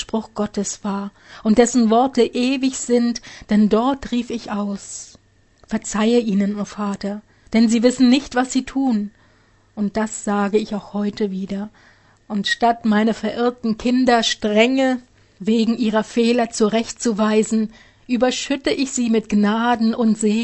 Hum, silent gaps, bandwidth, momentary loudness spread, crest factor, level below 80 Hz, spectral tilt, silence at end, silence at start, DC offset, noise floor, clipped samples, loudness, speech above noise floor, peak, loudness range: none; none; 8.6 kHz; 12 LU; 18 dB; -50 dBFS; -4.5 dB/octave; 0 s; 0 s; under 0.1%; -55 dBFS; under 0.1%; -19 LUFS; 36 dB; 0 dBFS; 5 LU